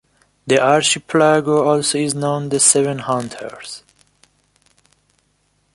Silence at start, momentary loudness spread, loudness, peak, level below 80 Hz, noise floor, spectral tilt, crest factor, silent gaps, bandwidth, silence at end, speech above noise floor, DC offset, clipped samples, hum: 0.45 s; 19 LU; -15 LUFS; 0 dBFS; -60 dBFS; -63 dBFS; -3 dB/octave; 18 dB; none; 11.5 kHz; 1.95 s; 47 dB; under 0.1%; under 0.1%; 50 Hz at -50 dBFS